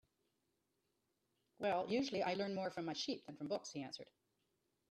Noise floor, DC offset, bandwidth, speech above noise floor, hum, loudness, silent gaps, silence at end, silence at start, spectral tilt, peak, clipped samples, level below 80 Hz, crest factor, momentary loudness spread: -85 dBFS; under 0.1%; 13 kHz; 43 dB; none; -42 LUFS; none; 0.85 s; 1.6 s; -4.5 dB/octave; -28 dBFS; under 0.1%; -84 dBFS; 18 dB; 11 LU